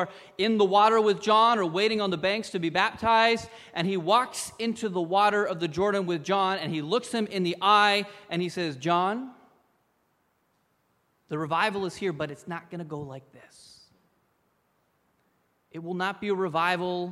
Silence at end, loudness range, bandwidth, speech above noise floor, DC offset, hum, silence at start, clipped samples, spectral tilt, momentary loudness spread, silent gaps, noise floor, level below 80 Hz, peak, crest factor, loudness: 0 s; 14 LU; 14 kHz; 45 dB; under 0.1%; none; 0 s; under 0.1%; -4.5 dB/octave; 16 LU; none; -71 dBFS; -66 dBFS; -8 dBFS; 20 dB; -26 LUFS